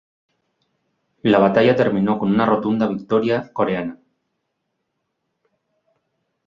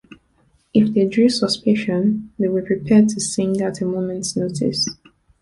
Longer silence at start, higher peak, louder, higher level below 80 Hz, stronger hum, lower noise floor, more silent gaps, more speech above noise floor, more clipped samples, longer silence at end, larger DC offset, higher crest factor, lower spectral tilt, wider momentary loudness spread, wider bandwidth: first, 1.25 s vs 0.1 s; about the same, -2 dBFS vs -4 dBFS; about the same, -18 LUFS vs -19 LUFS; about the same, -58 dBFS vs -54 dBFS; neither; first, -75 dBFS vs -60 dBFS; neither; first, 58 dB vs 42 dB; neither; first, 2.5 s vs 0.5 s; neither; about the same, 20 dB vs 16 dB; first, -8.5 dB/octave vs -5 dB/octave; about the same, 7 LU vs 8 LU; second, 7.2 kHz vs 11.5 kHz